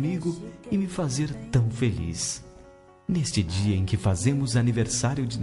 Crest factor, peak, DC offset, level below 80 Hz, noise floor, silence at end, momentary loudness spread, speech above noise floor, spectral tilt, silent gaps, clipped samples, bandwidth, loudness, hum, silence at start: 16 dB; -10 dBFS; under 0.1%; -48 dBFS; -51 dBFS; 0 s; 6 LU; 26 dB; -5.5 dB/octave; none; under 0.1%; 11.5 kHz; -26 LUFS; none; 0 s